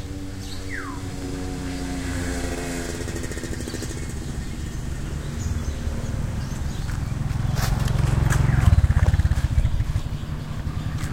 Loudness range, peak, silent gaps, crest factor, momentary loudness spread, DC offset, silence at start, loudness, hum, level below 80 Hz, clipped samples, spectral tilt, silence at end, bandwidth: 8 LU; -2 dBFS; none; 20 dB; 11 LU; 0.7%; 0 s; -26 LUFS; none; -28 dBFS; under 0.1%; -6 dB/octave; 0 s; 16.5 kHz